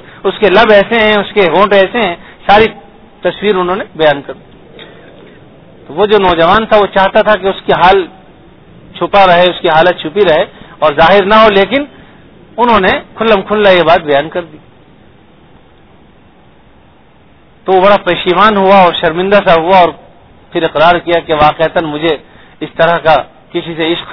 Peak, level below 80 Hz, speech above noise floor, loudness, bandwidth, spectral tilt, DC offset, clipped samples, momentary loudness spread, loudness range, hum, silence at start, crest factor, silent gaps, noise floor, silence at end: 0 dBFS; -38 dBFS; 35 dB; -9 LUFS; 5.4 kHz; -7 dB/octave; under 0.1%; 1%; 12 LU; 6 LU; none; 0.05 s; 10 dB; none; -43 dBFS; 0 s